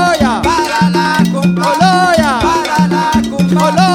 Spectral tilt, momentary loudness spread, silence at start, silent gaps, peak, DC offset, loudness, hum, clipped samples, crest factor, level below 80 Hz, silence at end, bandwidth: -5.5 dB/octave; 3 LU; 0 s; none; 0 dBFS; under 0.1%; -11 LUFS; none; under 0.1%; 10 dB; -34 dBFS; 0 s; 16 kHz